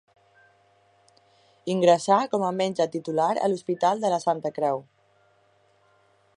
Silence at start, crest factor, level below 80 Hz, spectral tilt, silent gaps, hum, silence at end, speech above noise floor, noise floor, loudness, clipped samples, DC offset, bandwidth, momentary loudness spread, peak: 1.65 s; 22 dB; -78 dBFS; -5.5 dB/octave; none; none; 1.55 s; 40 dB; -63 dBFS; -24 LUFS; under 0.1%; under 0.1%; 11 kHz; 7 LU; -4 dBFS